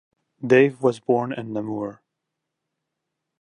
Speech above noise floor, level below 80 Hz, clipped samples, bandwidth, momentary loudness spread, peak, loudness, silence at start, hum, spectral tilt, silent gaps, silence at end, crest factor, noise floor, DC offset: 61 dB; -68 dBFS; under 0.1%; 10 kHz; 15 LU; -2 dBFS; -22 LUFS; 0.4 s; none; -7 dB/octave; none; 1.45 s; 22 dB; -82 dBFS; under 0.1%